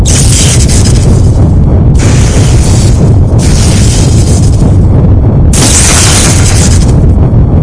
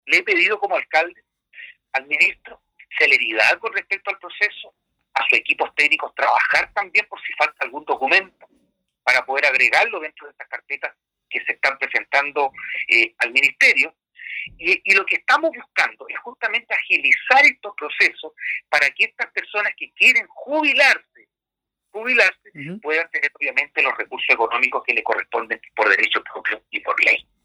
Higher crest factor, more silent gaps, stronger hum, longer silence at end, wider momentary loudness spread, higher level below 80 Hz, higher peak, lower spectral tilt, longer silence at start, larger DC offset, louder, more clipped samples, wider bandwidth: second, 4 dB vs 18 dB; neither; neither; second, 0 s vs 0.25 s; second, 3 LU vs 14 LU; first, -8 dBFS vs -68 dBFS; about the same, 0 dBFS vs -2 dBFS; first, -5 dB/octave vs -1.5 dB/octave; about the same, 0 s vs 0.05 s; neither; first, -5 LUFS vs -18 LUFS; first, 10% vs under 0.1%; second, 11 kHz vs 15.5 kHz